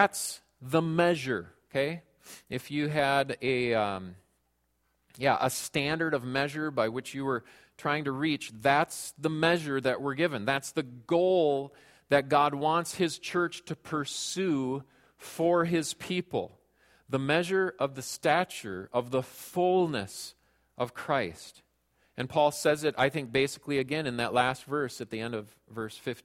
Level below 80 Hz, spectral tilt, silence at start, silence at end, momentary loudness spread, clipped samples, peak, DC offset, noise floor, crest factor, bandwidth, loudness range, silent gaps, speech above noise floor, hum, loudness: -66 dBFS; -4.5 dB/octave; 0 s; 0.05 s; 13 LU; under 0.1%; -6 dBFS; under 0.1%; -75 dBFS; 24 dB; 16.5 kHz; 3 LU; none; 45 dB; none; -30 LUFS